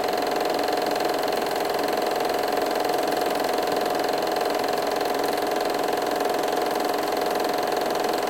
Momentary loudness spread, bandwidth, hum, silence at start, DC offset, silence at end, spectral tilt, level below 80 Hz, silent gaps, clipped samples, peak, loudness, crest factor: 1 LU; 17 kHz; none; 0 s; 0.1%; 0 s; -3 dB/octave; -62 dBFS; none; under 0.1%; -12 dBFS; -24 LUFS; 12 dB